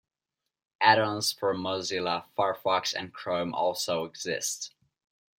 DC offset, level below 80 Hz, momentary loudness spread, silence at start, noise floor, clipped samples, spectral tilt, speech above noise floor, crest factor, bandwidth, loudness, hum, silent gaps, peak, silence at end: under 0.1%; -74 dBFS; 10 LU; 0.8 s; -87 dBFS; under 0.1%; -2.5 dB/octave; 59 dB; 24 dB; 16.5 kHz; -28 LUFS; none; none; -6 dBFS; 0.7 s